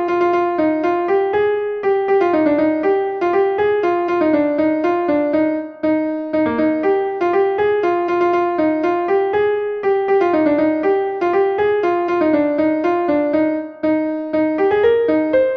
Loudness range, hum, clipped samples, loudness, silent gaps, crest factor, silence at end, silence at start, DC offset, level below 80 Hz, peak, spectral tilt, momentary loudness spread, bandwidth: 1 LU; none; under 0.1%; -17 LUFS; none; 12 dB; 0 s; 0 s; under 0.1%; -54 dBFS; -4 dBFS; -7.5 dB/octave; 4 LU; 6.2 kHz